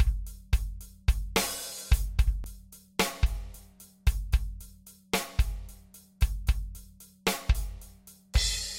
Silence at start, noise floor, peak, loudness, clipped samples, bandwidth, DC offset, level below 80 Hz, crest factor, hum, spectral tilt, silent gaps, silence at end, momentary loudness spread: 0 s; -53 dBFS; -10 dBFS; -31 LUFS; under 0.1%; 16 kHz; under 0.1%; -32 dBFS; 20 dB; none; -3.5 dB/octave; none; 0 s; 20 LU